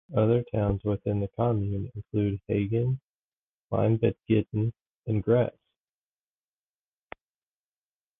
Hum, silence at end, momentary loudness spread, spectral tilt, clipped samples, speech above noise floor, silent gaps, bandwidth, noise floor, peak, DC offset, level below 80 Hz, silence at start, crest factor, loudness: none; 2.7 s; 8 LU; -12 dB/octave; under 0.1%; over 64 dB; 3.03-3.70 s, 4.87-5.02 s; 3.8 kHz; under -90 dBFS; -10 dBFS; under 0.1%; -50 dBFS; 0.1 s; 20 dB; -28 LUFS